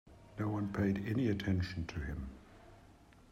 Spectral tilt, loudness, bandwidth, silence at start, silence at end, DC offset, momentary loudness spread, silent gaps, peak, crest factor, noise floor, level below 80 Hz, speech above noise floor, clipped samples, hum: -7.5 dB/octave; -37 LUFS; 13.5 kHz; 0.05 s; 0.4 s; under 0.1%; 15 LU; none; -22 dBFS; 16 dB; -61 dBFS; -54 dBFS; 25 dB; under 0.1%; none